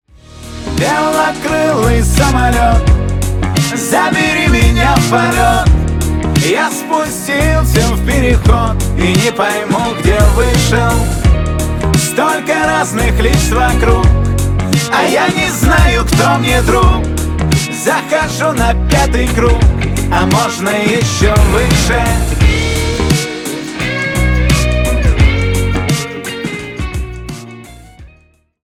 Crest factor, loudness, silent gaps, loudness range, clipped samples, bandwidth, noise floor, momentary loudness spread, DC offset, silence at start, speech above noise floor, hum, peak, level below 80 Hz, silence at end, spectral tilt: 12 dB; -12 LUFS; none; 2 LU; under 0.1%; 16.5 kHz; -49 dBFS; 6 LU; under 0.1%; 0.3 s; 39 dB; none; 0 dBFS; -16 dBFS; 0.55 s; -5 dB/octave